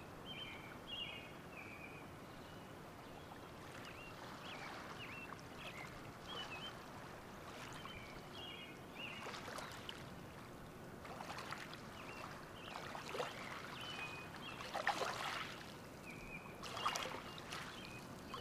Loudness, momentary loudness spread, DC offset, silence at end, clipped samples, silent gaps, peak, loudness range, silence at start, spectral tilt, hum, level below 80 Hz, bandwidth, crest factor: -49 LUFS; 11 LU; under 0.1%; 0 s; under 0.1%; none; -22 dBFS; 7 LU; 0 s; -3.5 dB/octave; none; -68 dBFS; 15.5 kHz; 28 dB